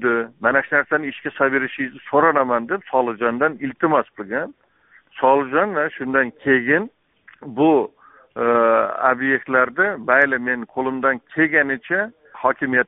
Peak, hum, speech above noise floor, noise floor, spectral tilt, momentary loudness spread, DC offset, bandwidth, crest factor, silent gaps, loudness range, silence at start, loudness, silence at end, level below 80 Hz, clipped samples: -2 dBFS; none; 36 dB; -55 dBFS; 1 dB/octave; 9 LU; under 0.1%; 3.9 kHz; 18 dB; none; 3 LU; 0 s; -19 LUFS; 0.05 s; -64 dBFS; under 0.1%